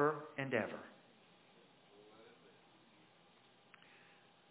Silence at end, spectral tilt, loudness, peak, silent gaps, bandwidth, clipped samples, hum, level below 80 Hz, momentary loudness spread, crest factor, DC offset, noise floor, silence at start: 2.2 s; -4.5 dB/octave; -41 LUFS; -20 dBFS; none; 4 kHz; under 0.1%; none; -86 dBFS; 27 LU; 26 dB; under 0.1%; -68 dBFS; 0 s